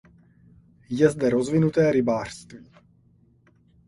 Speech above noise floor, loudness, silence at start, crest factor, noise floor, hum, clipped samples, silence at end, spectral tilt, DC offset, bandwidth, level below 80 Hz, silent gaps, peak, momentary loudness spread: 37 dB; -22 LUFS; 0.9 s; 20 dB; -59 dBFS; none; under 0.1%; 1.3 s; -7 dB/octave; under 0.1%; 11.5 kHz; -56 dBFS; none; -4 dBFS; 14 LU